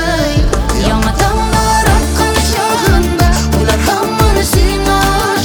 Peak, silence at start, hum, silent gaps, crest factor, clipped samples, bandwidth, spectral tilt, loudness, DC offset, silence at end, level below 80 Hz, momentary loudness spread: 0 dBFS; 0 s; none; none; 10 dB; under 0.1%; over 20 kHz; -4.5 dB/octave; -12 LUFS; under 0.1%; 0 s; -16 dBFS; 2 LU